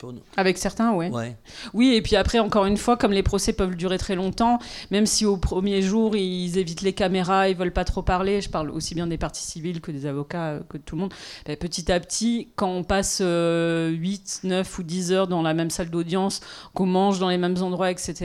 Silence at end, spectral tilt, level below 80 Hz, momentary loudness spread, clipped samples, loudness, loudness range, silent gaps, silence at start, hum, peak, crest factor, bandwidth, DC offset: 0 s; -5 dB/octave; -38 dBFS; 10 LU; under 0.1%; -24 LUFS; 6 LU; none; 0 s; none; -6 dBFS; 16 dB; 14.5 kHz; under 0.1%